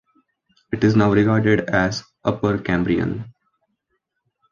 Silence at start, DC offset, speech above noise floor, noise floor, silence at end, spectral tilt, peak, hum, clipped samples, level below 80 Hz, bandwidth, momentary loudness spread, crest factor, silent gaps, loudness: 0.7 s; under 0.1%; 56 dB; -74 dBFS; 1.2 s; -7 dB/octave; -2 dBFS; none; under 0.1%; -46 dBFS; 7.2 kHz; 11 LU; 18 dB; none; -19 LUFS